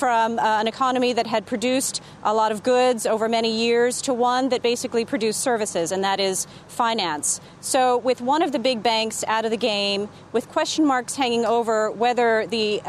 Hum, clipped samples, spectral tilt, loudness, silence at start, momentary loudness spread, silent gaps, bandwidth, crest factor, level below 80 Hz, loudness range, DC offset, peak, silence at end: none; under 0.1%; -2.5 dB/octave; -22 LUFS; 0 s; 4 LU; none; 13.5 kHz; 16 dB; -64 dBFS; 1 LU; under 0.1%; -6 dBFS; 0 s